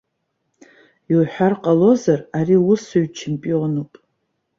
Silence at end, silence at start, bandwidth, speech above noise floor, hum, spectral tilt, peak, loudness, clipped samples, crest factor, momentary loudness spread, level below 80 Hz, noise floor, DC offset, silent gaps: 0.75 s; 1.1 s; 7.6 kHz; 56 dB; none; -7.5 dB/octave; -2 dBFS; -18 LUFS; under 0.1%; 16 dB; 10 LU; -60 dBFS; -73 dBFS; under 0.1%; none